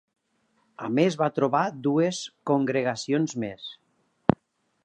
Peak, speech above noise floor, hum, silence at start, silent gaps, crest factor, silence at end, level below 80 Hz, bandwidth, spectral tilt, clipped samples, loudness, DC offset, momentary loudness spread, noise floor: 0 dBFS; 46 dB; none; 0.8 s; none; 26 dB; 1.1 s; -62 dBFS; 9.6 kHz; -6 dB/octave; under 0.1%; -26 LUFS; under 0.1%; 11 LU; -72 dBFS